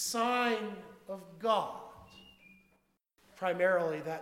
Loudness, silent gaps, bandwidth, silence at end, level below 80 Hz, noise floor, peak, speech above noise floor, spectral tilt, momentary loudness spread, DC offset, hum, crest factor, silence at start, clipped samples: -32 LUFS; none; 17 kHz; 0 s; -74 dBFS; -74 dBFS; -16 dBFS; 41 dB; -3 dB/octave; 19 LU; under 0.1%; none; 20 dB; 0 s; under 0.1%